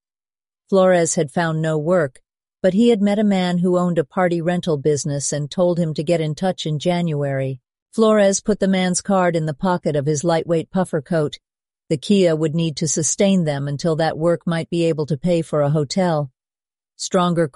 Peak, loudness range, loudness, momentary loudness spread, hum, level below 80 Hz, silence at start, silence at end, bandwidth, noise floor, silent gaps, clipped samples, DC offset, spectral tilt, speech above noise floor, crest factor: -4 dBFS; 2 LU; -19 LUFS; 6 LU; none; -54 dBFS; 0.7 s; 0.05 s; 11.5 kHz; under -90 dBFS; 7.82-7.86 s; under 0.1%; under 0.1%; -5.5 dB/octave; over 72 dB; 14 dB